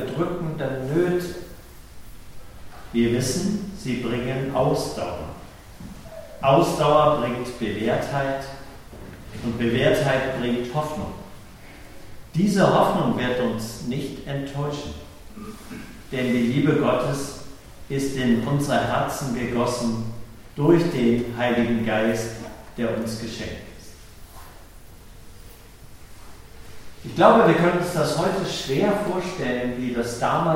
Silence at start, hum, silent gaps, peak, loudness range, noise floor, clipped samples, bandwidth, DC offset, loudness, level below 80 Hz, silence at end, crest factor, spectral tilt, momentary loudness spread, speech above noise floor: 0 s; none; none; -2 dBFS; 7 LU; -43 dBFS; under 0.1%; 16.5 kHz; under 0.1%; -23 LUFS; -46 dBFS; 0 s; 22 dB; -6 dB/octave; 22 LU; 21 dB